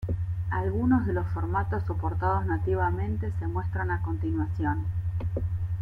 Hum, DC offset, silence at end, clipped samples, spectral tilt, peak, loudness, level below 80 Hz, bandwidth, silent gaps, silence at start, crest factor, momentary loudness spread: none; under 0.1%; 0 s; under 0.1%; -10.5 dB/octave; -12 dBFS; -29 LUFS; -40 dBFS; 3.2 kHz; none; 0 s; 16 dB; 6 LU